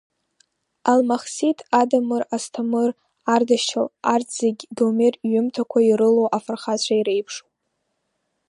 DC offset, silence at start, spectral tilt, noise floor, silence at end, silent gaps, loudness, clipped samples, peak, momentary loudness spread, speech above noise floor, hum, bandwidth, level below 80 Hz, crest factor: under 0.1%; 0.85 s; -4 dB/octave; -75 dBFS; 1.1 s; none; -21 LUFS; under 0.1%; -4 dBFS; 8 LU; 55 dB; none; 11.5 kHz; -76 dBFS; 18 dB